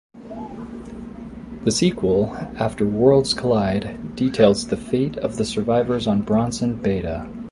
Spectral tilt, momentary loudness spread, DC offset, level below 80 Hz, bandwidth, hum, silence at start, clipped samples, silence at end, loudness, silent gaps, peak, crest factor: -5.5 dB/octave; 18 LU; under 0.1%; -44 dBFS; 11.5 kHz; none; 0.15 s; under 0.1%; 0 s; -20 LUFS; none; -2 dBFS; 18 dB